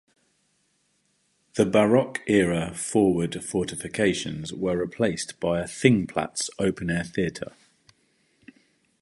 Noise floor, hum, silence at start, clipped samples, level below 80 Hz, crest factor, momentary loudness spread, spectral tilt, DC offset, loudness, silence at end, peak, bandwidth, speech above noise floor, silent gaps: -70 dBFS; none; 1.55 s; under 0.1%; -54 dBFS; 24 dB; 9 LU; -5 dB/octave; under 0.1%; -25 LUFS; 1.55 s; -2 dBFS; 11.5 kHz; 45 dB; none